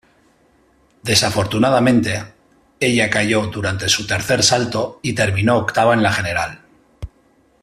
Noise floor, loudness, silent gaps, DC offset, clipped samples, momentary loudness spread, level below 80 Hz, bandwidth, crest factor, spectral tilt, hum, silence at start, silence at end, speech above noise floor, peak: -56 dBFS; -17 LUFS; none; under 0.1%; under 0.1%; 12 LU; -46 dBFS; 15 kHz; 18 dB; -4 dB/octave; none; 1.05 s; 0.55 s; 39 dB; 0 dBFS